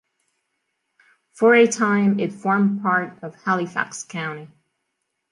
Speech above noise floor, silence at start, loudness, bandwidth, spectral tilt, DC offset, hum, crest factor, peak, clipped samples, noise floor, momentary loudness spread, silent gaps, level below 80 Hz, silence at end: 57 dB; 1.35 s; -20 LUFS; 11 kHz; -5.5 dB/octave; under 0.1%; none; 18 dB; -4 dBFS; under 0.1%; -77 dBFS; 14 LU; none; -72 dBFS; 0.85 s